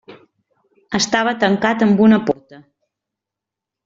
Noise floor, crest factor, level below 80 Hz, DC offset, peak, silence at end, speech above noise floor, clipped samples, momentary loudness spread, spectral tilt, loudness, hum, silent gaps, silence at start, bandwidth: -85 dBFS; 16 dB; -58 dBFS; under 0.1%; -2 dBFS; 1.3 s; 70 dB; under 0.1%; 11 LU; -4 dB/octave; -16 LUFS; none; none; 0.1 s; 7.8 kHz